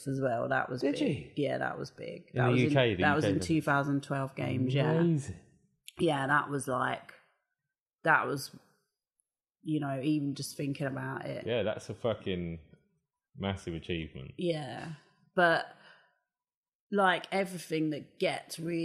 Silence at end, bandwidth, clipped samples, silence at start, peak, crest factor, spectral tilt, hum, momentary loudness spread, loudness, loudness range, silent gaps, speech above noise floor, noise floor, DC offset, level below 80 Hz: 0 s; 14.5 kHz; under 0.1%; 0 s; -10 dBFS; 22 dB; -6 dB/octave; none; 14 LU; -32 LUFS; 7 LU; 7.80-7.86 s, 16.57-16.63 s, 16.75-16.90 s; over 59 dB; under -90 dBFS; under 0.1%; -64 dBFS